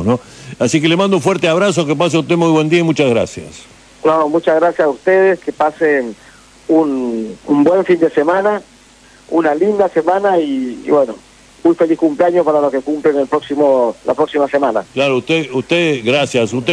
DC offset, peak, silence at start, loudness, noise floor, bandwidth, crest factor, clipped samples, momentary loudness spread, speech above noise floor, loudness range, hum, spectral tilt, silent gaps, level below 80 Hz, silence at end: under 0.1%; 0 dBFS; 0 s; -14 LUFS; -44 dBFS; 11 kHz; 12 dB; under 0.1%; 7 LU; 31 dB; 2 LU; none; -5.5 dB/octave; none; -54 dBFS; 0 s